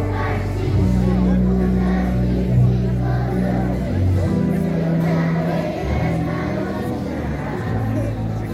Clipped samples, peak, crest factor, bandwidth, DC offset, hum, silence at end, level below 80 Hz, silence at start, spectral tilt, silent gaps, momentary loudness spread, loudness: under 0.1%; -6 dBFS; 12 dB; 14 kHz; under 0.1%; none; 0 s; -28 dBFS; 0 s; -8.5 dB/octave; none; 7 LU; -20 LUFS